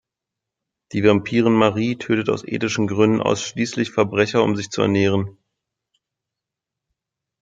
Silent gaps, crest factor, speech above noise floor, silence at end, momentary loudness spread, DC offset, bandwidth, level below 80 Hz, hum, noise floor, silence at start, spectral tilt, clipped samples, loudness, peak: none; 20 dB; 66 dB; 2.1 s; 7 LU; under 0.1%; 9 kHz; -58 dBFS; none; -85 dBFS; 0.9 s; -5.5 dB/octave; under 0.1%; -19 LUFS; -2 dBFS